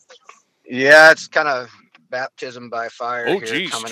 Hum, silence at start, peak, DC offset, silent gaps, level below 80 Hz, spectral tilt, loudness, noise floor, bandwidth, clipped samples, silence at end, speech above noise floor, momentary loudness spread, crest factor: none; 0.7 s; 0 dBFS; under 0.1%; none; -76 dBFS; -2.5 dB/octave; -14 LUFS; -50 dBFS; 16 kHz; under 0.1%; 0 s; 33 dB; 21 LU; 18 dB